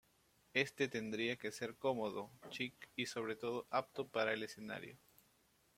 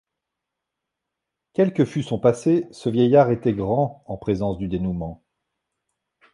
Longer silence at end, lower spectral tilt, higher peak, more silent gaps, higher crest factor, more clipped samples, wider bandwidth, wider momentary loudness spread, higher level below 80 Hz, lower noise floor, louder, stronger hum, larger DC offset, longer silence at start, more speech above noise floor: second, 0.8 s vs 1.2 s; second, -4 dB/octave vs -8 dB/octave; second, -20 dBFS vs -4 dBFS; neither; about the same, 22 dB vs 20 dB; neither; first, 16.5 kHz vs 11.5 kHz; about the same, 10 LU vs 11 LU; second, -80 dBFS vs -48 dBFS; second, -75 dBFS vs -83 dBFS; second, -42 LUFS vs -22 LUFS; neither; neither; second, 0.55 s vs 1.6 s; second, 33 dB vs 63 dB